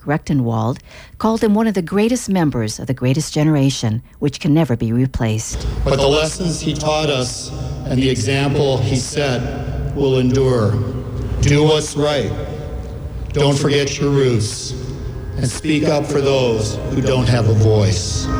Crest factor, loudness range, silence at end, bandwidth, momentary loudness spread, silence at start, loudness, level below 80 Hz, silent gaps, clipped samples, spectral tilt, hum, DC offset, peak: 14 dB; 1 LU; 0 s; 19.5 kHz; 10 LU; 0 s; -17 LUFS; -32 dBFS; none; under 0.1%; -5.5 dB/octave; none; under 0.1%; -4 dBFS